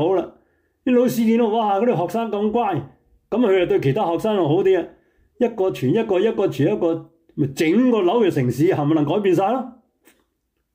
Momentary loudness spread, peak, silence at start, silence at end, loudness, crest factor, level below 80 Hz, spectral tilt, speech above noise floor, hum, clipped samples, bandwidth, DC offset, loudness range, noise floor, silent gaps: 9 LU; -8 dBFS; 0 s; 1.05 s; -19 LUFS; 12 dB; -58 dBFS; -7 dB/octave; 54 dB; none; under 0.1%; 16 kHz; under 0.1%; 2 LU; -72 dBFS; none